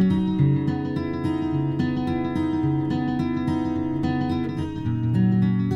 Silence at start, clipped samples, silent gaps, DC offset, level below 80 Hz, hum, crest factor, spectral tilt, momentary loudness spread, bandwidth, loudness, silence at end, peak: 0 s; under 0.1%; none; under 0.1%; -46 dBFS; none; 14 dB; -9 dB/octave; 5 LU; 7.6 kHz; -24 LUFS; 0 s; -8 dBFS